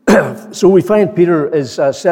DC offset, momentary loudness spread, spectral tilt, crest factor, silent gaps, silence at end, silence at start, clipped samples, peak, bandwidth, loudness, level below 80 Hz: under 0.1%; 6 LU; -6.5 dB/octave; 10 dB; none; 0 s; 0.05 s; under 0.1%; 0 dBFS; 16.5 kHz; -12 LUFS; -48 dBFS